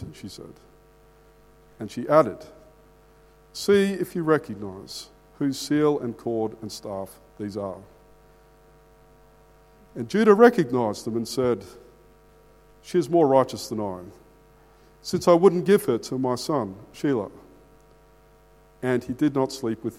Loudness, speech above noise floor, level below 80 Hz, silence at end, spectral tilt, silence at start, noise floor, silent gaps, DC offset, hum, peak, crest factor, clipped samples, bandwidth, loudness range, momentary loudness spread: -23 LUFS; 32 dB; -58 dBFS; 0 s; -6 dB/octave; 0 s; -55 dBFS; none; under 0.1%; none; -2 dBFS; 24 dB; under 0.1%; 16 kHz; 7 LU; 20 LU